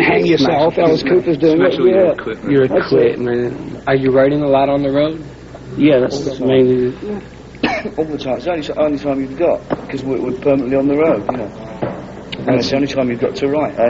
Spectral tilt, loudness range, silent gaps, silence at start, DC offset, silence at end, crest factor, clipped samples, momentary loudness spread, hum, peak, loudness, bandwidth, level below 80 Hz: -5 dB/octave; 5 LU; none; 0 s; under 0.1%; 0 s; 14 dB; under 0.1%; 12 LU; none; -2 dBFS; -15 LUFS; 7.8 kHz; -44 dBFS